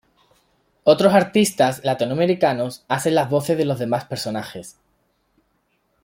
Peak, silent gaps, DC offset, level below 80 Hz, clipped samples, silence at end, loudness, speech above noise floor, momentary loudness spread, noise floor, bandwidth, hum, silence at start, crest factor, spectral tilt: -2 dBFS; none; under 0.1%; -62 dBFS; under 0.1%; 1.35 s; -19 LUFS; 48 dB; 11 LU; -67 dBFS; 16.5 kHz; none; 0.85 s; 18 dB; -5 dB/octave